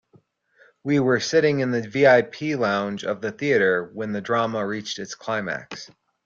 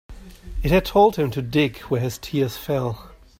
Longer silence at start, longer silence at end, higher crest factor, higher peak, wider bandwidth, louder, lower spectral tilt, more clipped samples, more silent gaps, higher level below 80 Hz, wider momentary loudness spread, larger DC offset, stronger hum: first, 0.85 s vs 0.1 s; about the same, 0.4 s vs 0.3 s; about the same, 18 dB vs 18 dB; about the same, -4 dBFS vs -4 dBFS; second, 7.6 kHz vs 16 kHz; about the same, -22 LUFS vs -22 LUFS; second, -5 dB/octave vs -6.5 dB/octave; neither; neither; second, -66 dBFS vs -36 dBFS; about the same, 13 LU vs 12 LU; neither; neither